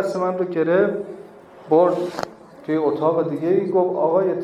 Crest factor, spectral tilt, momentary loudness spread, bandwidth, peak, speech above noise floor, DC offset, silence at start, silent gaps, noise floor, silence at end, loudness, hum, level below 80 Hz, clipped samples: 16 dB; -7.5 dB/octave; 14 LU; 11 kHz; -4 dBFS; 22 dB; under 0.1%; 0 s; none; -42 dBFS; 0 s; -20 LUFS; none; -68 dBFS; under 0.1%